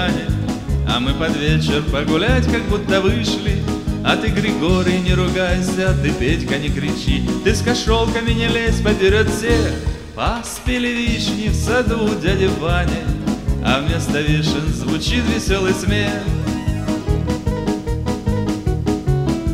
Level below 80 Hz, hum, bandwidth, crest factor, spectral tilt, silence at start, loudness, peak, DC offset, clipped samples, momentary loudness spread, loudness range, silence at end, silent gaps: -26 dBFS; none; 16 kHz; 18 dB; -5.5 dB/octave; 0 s; -18 LUFS; 0 dBFS; 0.4%; under 0.1%; 5 LU; 2 LU; 0 s; none